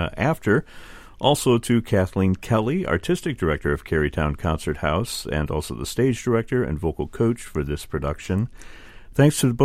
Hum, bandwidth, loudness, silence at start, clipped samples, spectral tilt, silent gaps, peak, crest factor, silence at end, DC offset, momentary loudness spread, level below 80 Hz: none; 16 kHz; -23 LUFS; 0 s; under 0.1%; -6 dB/octave; none; -2 dBFS; 20 dB; 0 s; under 0.1%; 8 LU; -38 dBFS